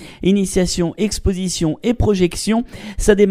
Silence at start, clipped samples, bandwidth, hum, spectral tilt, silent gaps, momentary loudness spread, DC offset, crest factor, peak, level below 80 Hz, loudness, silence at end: 0 s; under 0.1%; 15.5 kHz; none; -5.5 dB/octave; none; 4 LU; under 0.1%; 16 dB; 0 dBFS; -28 dBFS; -18 LUFS; 0 s